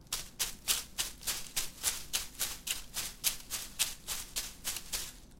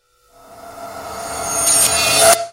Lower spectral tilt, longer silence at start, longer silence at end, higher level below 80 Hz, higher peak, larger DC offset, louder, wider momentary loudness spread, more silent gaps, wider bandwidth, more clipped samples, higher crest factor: about the same, 0.5 dB/octave vs 0 dB/octave; second, 0 s vs 0.5 s; about the same, 0 s vs 0 s; second, -54 dBFS vs -46 dBFS; second, -8 dBFS vs 0 dBFS; neither; second, -35 LUFS vs -12 LUFS; second, 6 LU vs 21 LU; neither; about the same, 17 kHz vs 16 kHz; neither; first, 30 dB vs 18 dB